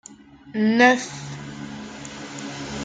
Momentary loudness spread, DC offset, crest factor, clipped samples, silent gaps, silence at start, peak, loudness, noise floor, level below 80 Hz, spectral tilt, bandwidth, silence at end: 19 LU; under 0.1%; 22 dB; under 0.1%; none; 0.1 s; -2 dBFS; -20 LUFS; -46 dBFS; -56 dBFS; -4.5 dB/octave; 9.4 kHz; 0 s